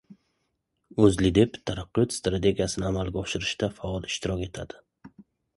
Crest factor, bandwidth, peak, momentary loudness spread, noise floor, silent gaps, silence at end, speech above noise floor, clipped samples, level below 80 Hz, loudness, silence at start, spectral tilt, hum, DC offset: 22 dB; 11.5 kHz; -6 dBFS; 13 LU; -77 dBFS; none; 0.5 s; 51 dB; under 0.1%; -44 dBFS; -26 LUFS; 0.1 s; -5.5 dB/octave; none; under 0.1%